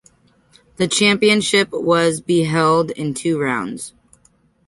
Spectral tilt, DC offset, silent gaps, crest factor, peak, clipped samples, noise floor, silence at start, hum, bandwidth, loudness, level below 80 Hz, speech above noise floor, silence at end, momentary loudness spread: -4 dB/octave; under 0.1%; none; 18 dB; -2 dBFS; under 0.1%; -57 dBFS; 0.8 s; none; 11.5 kHz; -17 LUFS; -56 dBFS; 40 dB; 0.8 s; 10 LU